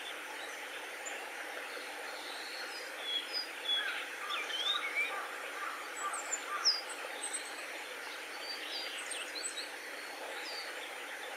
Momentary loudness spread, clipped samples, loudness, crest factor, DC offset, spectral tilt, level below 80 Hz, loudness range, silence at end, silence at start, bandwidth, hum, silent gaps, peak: 9 LU; under 0.1%; -38 LUFS; 22 dB; under 0.1%; 2 dB/octave; -88 dBFS; 5 LU; 0 s; 0 s; 16 kHz; none; none; -20 dBFS